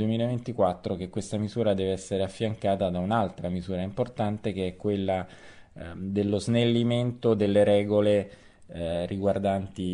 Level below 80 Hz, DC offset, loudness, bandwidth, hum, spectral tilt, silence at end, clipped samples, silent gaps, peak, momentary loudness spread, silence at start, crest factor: -54 dBFS; under 0.1%; -27 LUFS; 10.5 kHz; none; -7 dB/octave; 0 s; under 0.1%; none; -10 dBFS; 10 LU; 0 s; 16 dB